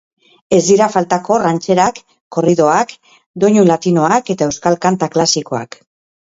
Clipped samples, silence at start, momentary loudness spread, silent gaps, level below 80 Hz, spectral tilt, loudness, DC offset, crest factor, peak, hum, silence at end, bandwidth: under 0.1%; 0.5 s; 11 LU; 2.21-2.31 s, 3.26-3.34 s; -54 dBFS; -5 dB/octave; -14 LUFS; under 0.1%; 14 dB; 0 dBFS; none; 0.65 s; 8 kHz